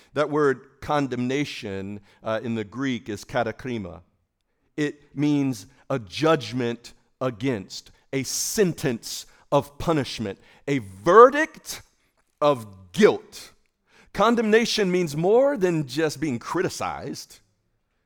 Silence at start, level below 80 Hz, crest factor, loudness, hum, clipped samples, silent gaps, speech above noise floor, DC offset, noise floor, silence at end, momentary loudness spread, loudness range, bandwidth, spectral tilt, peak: 0.15 s; -56 dBFS; 24 dB; -24 LUFS; none; under 0.1%; none; 49 dB; under 0.1%; -72 dBFS; 0.8 s; 16 LU; 8 LU; over 20 kHz; -5 dB/octave; -2 dBFS